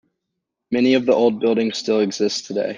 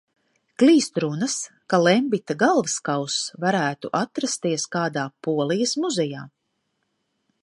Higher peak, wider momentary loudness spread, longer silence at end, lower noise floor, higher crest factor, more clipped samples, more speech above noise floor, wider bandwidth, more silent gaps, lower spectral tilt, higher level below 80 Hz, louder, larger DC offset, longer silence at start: about the same, -4 dBFS vs -4 dBFS; about the same, 6 LU vs 8 LU; second, 0 s vs 1.15 s; first, -79 dBFS vs -74 dBFS; about the same, 16 dB vs 20 dB; neither; first, 61 dB vs 52 dB; second, 9.6 kHz vs 11.5 kHz; neither; about the same, -4.5 dB/octave vs -4 dB/octave; first, -64 dBFS vs -74 dBFS; first, -19 LUFS vs -22 LUFS; neither; about the same, 0.7 s vs 0.6 s